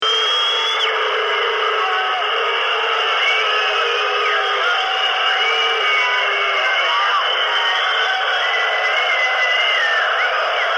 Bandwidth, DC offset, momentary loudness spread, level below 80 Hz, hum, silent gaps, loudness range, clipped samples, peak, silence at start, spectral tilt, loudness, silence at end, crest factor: 13 kHz; under 0.1%; 3 LU; -66 dBFS; none; none; 1 LU; under 0.1%; -6 dBFS; 0 s; 1.5 dB/octave; -16 LUFS; 0 s; 12 dB